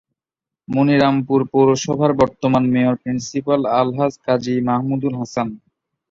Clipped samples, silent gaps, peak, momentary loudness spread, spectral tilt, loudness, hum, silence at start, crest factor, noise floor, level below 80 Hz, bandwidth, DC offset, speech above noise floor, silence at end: under 0.1%; none; -2 dBFS; 8 LU; -6.5 dB/octave; -18 LUFS; none; 0.7 s; 16 dB; -87 dBFS; -52 dBFS; 7.6 kHz; under 0.1%; 70 dB; 0.55 s